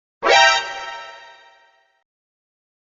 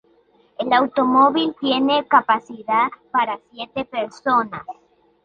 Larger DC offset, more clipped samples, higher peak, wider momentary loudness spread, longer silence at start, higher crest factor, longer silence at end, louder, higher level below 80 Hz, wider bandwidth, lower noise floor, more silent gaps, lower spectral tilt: neither; neither; about the same, 0 dBFS vs -2 dBFS; first, 23 LU vs 14 LU; second, 0.2 s vs 0.6 s; about the same, 22 dB vs 18 dB; first, 1.7 s vs 0.55 s; first, -15 LUFS vs -19 LUFS; first, -58 dBFS vs -64 dBFS; about the same, 7.6 kHz vs 7.2 kHz; about the same, -56 dBFS vs -57 dBFS; neither; second, 3.5 dB/octave vs -5.5 dB/octave